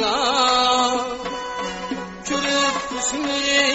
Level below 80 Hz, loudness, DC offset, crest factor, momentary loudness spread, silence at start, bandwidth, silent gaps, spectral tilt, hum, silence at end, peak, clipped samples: -50 dBFS; -20 LUFS; under 0.1%; 16 dB; 11 LU; 0 s; 8.2 kHz; none; -1.5 dB/octave; none; 0 s; -6 dBFS; under 0.1%